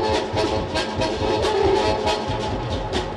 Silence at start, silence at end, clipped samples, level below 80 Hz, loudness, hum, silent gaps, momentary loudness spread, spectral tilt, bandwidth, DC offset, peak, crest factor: 0 s; 0 s; under 0.1%; -36 dBFS; -22 LUFS; none; none; 6 LU; -5 dB/octave; 12 kHz; under 0.1%; -8 dBFS; 14 dB